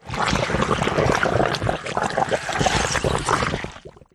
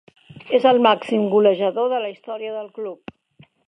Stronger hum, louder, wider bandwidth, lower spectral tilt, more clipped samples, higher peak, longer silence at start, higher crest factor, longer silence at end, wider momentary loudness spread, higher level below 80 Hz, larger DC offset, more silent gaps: neither; about the same, -21 LUFS vs -19 LUFS; first, 13 kHz vs 9.6 kHz; second, -4 dB/octave vs -6.5 dB/octave; neither; about the same, -4 dBFS vs -2 dBFS; second, 0.05 s vs 0.35 s; about the same, 18 dB vs 18 dB; second, 0.25 s vs 0.7 s; second, 5 LU vs 16 LU; first, -36 dBFS vs -70 dBFS; neither; neither